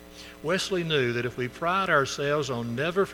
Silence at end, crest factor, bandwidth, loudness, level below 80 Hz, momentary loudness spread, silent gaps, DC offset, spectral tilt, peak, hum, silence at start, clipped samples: 0 s; 18 dB; 19 kHz; -27 LUFS; -56 dBFS; 8 LU; none; under 0.1%; -4.5 dB/octave; -10 dBFS; none; 0 s; under 0.1%